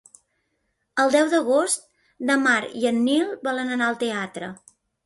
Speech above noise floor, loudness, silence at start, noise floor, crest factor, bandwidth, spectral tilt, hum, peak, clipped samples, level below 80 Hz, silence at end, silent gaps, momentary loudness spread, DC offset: 52 dB; -22 LUFS; 0.95 s; -74 dBFS; 18 dB; 11.5 kHz; -3 dB/octave; none; -4 dBFS; under 0.1%; -70 dBFS; 0.5 s; none; 11 LU; under 0.1%